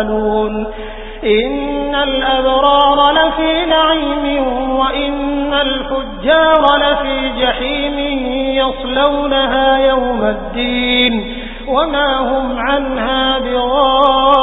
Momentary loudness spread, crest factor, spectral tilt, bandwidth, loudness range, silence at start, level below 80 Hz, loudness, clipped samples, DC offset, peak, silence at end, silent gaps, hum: 8 LU; 14 dB; -7 dB/octave; 4 kHz; 2 LU; 0 s; -30 dBFS; -13 LUFS; under 0.1%; under 0.1%; 0 dBFS; 0 s; none; none